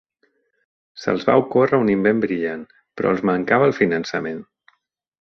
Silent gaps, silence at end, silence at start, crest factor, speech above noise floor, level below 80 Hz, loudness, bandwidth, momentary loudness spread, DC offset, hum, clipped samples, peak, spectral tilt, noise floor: none; 0.8 s; 0.95 s; 18 dB; 50 dB; -58 dBFS; -19 LUFS; 6.4 kHz; 13 LU; under 0.1%; none; under 0.1%; -2 dBFS; -7 dB/octave; -69 dBFS